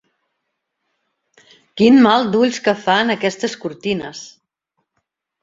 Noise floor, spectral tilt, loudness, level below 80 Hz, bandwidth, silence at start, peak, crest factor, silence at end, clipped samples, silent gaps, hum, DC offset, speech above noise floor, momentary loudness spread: -75 dBFS; -5 dB/octave; -16 LUFS; -60 dBFS; 7.8 kHz; 1.75 s; -2 dBFS; 18 dB; 1.15 s; under 0.1%; none; none; under 0.1%; 60 dB; 16 LU